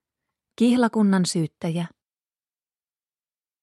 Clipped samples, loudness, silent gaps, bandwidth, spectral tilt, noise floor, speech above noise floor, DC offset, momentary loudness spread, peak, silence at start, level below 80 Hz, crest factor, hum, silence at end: under 0.1%; -22 LUFS; none; 12.5 kHz; -6 dB/octave; under -90 dBFS; over 69 dB; under 0.1%; 10 LU; -8 dBFS; 0.6 s; -70 dBFS; 18 dB; none; 1.75 s